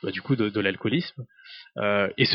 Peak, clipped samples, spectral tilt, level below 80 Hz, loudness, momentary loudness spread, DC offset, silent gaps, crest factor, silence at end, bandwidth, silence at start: -8 dBFS; under 0.1%; -8.5 dB/octave; -66 dBFS; -25 LUFS; 19 LU; under 0.1%; none; 18 dB; 0 s; 6 kHz; 0.05 s